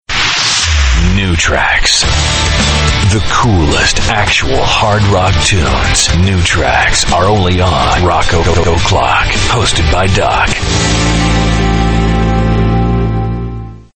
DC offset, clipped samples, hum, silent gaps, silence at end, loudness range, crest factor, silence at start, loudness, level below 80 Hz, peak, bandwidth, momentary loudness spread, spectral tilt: under 0.1%; under 0.1%; none; none; 0.15 s; 1 LU; 10 dB; 0.1 s; -10 LUFS; -18 dBFS; 0 dBFS; 9.2 kHz; 3 LU; -4 dB/octave